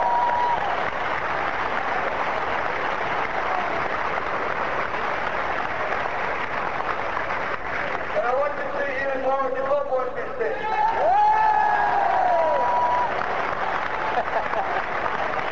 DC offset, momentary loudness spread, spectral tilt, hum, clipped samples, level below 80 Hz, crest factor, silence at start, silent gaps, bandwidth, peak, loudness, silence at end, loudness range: 2%; 6 LU; -5 dB/octave; none; under 0.1%; -50 dBFS; 14 dB; 0 s; none; 8 kHz; -10 dBFS; -24 LUFS; 0 s; 5 LU